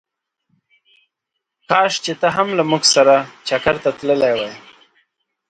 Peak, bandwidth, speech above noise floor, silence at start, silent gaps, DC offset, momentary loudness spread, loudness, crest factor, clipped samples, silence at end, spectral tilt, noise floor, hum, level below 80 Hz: 0 dBFS; 9.2 kHz; 63 dB; 1.7 s; none; under 0.1%; 8 LU; -16 LUFS; 18 dB; under 0.1%; 0.9 s; -3 dB/octave; -79 dBFS; none; -54 dBFS